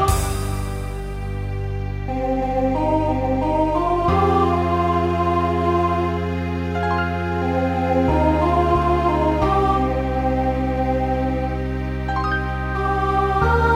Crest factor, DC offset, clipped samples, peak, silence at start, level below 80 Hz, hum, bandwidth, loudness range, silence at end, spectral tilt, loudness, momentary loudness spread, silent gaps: 16 dB; under 0.1%; under 0.1%; -4 dBFS; 0 s; -28 dBFS; none; 16 kHz; 3 LU; 0 s; -7 dB/octave; -20 LUFS; 8 LU; none